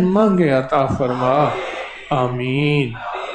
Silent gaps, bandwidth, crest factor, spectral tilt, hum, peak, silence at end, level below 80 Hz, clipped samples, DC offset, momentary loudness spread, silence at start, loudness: none; 9.4 kHz; 14 dB; -7.5 dB/octave; none; -4 dBFS; 0 s; -46 dBFS; under 0.1%; under 0.1%; 10 LU; 0 s; -18 LUFS